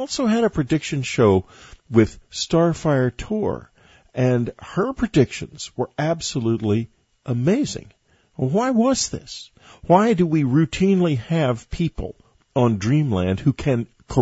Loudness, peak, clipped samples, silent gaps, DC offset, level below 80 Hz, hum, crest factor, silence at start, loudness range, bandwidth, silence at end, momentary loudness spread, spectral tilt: -21 LUFS; -2 dBFS; under 0.1%; none; under 0.1%; -44 dBFS; none; 20 dB; 0 s; 4 LU; 8 kHz; 0 s; 11 LU; -6 dB/octave